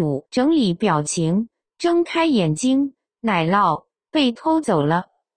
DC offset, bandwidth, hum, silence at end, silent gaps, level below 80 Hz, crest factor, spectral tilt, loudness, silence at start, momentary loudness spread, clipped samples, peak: under 0.1%; 10 kHz; none; 0.35 s; none; -56 dBFS; 16 dB; -5.5 dB/octave; -20 LUFS; 0 s; 7 LU; under 0.1%; -4 dBFS